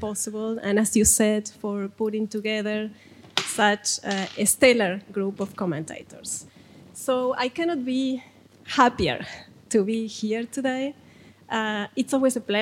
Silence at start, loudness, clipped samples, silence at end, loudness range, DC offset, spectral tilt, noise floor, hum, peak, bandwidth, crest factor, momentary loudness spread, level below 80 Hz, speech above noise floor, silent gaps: 0 s; -24 LUFS; under 0.1%; 0 s; 5 LU; under 0.1%; -3 dB/octave; -49 dBFS; none; -4 dBFS; 16.5 kHz; 22 dB; 14 LU; -54 dBFS; 25 dB; none